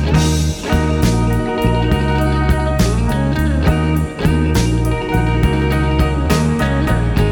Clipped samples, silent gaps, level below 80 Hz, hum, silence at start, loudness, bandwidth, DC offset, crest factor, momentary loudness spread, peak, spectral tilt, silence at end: under 0.1%; none; -20 dBFS; none; 0 s; -16 LUFS; 18 kHz; under 0.1%; 14 dB; 2 LU; 0 dBFS; -6.5 dB/octave; 0 s